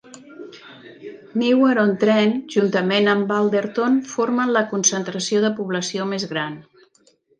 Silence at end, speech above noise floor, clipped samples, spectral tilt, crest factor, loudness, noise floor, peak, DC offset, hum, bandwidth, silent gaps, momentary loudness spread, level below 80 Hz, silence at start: 0.8 s; 40 dB; under 0.1%; -4 dB/octave; 16 dB; -20 LUFS; -59 dBFS; -4 dBFS; under 0.1%; none; 10.5 kHz; none; 22 LU; -70 dBFS; 0.1 s